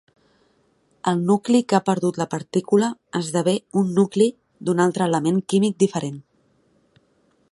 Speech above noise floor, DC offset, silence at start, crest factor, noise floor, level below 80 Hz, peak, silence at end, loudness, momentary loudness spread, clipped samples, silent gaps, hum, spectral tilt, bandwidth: 43 dB; under 0.1%; 1.05 s; 20 dB; -63 dBFS; -66 dBFS; -2 dBFS; 1.3 s; -21 LUFS; 9 LU; under 0.1%; none; none; -6 dB/octave; 11.5 kHz